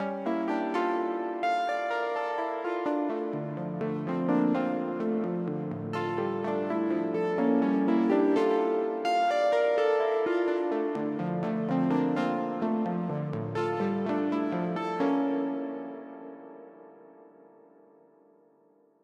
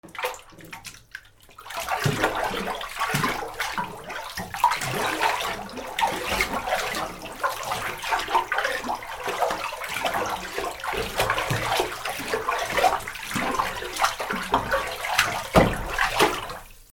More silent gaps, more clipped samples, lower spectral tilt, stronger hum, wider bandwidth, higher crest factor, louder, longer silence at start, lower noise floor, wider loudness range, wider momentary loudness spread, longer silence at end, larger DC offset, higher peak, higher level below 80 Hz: neither; neither; first, -7.5 dB/octave vs -3 dB/octave; neither; second, 9.4 kHz vs over 20 kHz; second, 16 dB vs 24 dB; second, -29 LUFS vs -26 LUFS; about the same, 0 s vs 0.05 s; first, -64 dBFS vs -48 dBFS; first, 7 LU vs 4 LU; second, 8 LU vs 11 LU; first, 1.75 s vs 0.1 s; neither; second, -14 dBFS vs -2 dBFS; second, -76 dBFS vs -44 dBFS